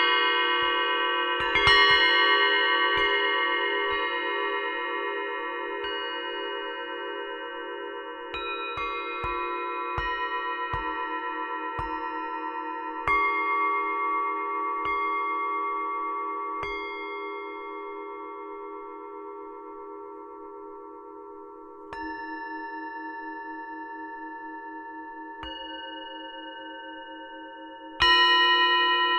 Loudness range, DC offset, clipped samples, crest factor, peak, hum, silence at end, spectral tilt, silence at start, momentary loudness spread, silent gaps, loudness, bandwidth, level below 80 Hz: 18 LU; under 0.1%; under 0.1%; 20 dB; -8 dBFS; none; 0 s; -3.5 dB/octave; 0 s; 21 LU; none; -25 LUFS; 9.6 kHz; -54 dBFS